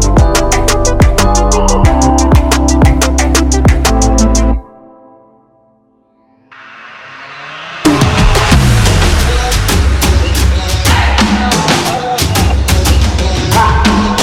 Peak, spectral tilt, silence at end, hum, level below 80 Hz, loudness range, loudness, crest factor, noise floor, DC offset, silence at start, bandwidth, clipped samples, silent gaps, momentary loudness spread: 0 dBFS; -4.5 dB/octave; 0 s; none; -14 dBFS; 8 LU; -10 LUFS; 10 dB; -51 dBFS; under 0.1%; 0 s; 16.5 kHz; under 0.1%; none; 5 LU